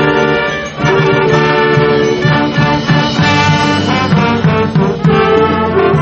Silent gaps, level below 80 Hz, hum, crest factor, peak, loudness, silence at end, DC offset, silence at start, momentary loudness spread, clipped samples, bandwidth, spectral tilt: none; -34 dBFS; none; 10 dB; 0 dBFS; -11 LUFS; 0 s; under 0.1%; 0 s; 3 LU; under 0.1%; 8.4 kHz; -6 dB/octave